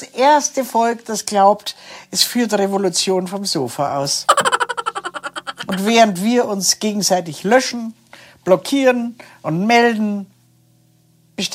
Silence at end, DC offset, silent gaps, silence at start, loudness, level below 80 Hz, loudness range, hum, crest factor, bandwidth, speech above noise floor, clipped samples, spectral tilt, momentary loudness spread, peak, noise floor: 0 s; under 0.1%; none; 0 s; -17 LUFS; -68 dBFS; 2 LU; none; 18 dB; 16 kHz; 38 dB; under 0.1%; -3 dB/octave; 14 LU; 0 dBFS; -55 dBFS